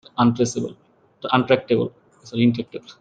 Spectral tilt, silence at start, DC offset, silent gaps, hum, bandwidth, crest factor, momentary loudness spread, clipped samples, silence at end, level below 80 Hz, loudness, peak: -6 dB/octave; 0.15 s; under 0.1%; none; none; 9 kHz; 20 dB; 13 LU; under 0.1%; 0.1 s; -60 dBFS; -21 LUFS; -2 dBFS